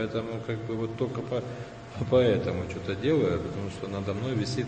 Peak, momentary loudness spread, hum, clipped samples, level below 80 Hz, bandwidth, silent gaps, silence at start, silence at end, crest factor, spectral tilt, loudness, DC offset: -10 dBFS; 11 LU; none; under 0.1%; -52 dBFS; 8.8 kHz; none; 0 s; 0 s; 18 dB; -7 dB/octave; -29 LUFS; under 0.1%